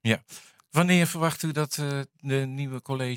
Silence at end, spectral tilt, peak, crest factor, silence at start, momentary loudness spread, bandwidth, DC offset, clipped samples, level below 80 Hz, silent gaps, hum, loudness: 0 s; -5 dB/octave; -6 dBFS; 22 dB; 0.05 s; 12 LU; 17 kHz; under 0.1%; under 0.1%; -70 dBFS; none; none; -27 LUFS